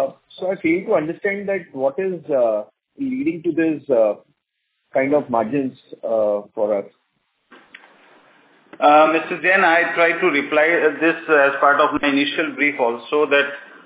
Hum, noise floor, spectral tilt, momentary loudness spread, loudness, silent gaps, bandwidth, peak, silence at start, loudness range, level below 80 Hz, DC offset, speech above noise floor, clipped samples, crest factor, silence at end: none; -74 dBFS; -8.5 dB/octave; 11 LU; -18 LUFS; none; 4 kHz; -2 dBFS; 0 s; 7 LU; -64 dBFS; under 0.1%; 56 dB; under 0.1%; 18 dB; 0.2 s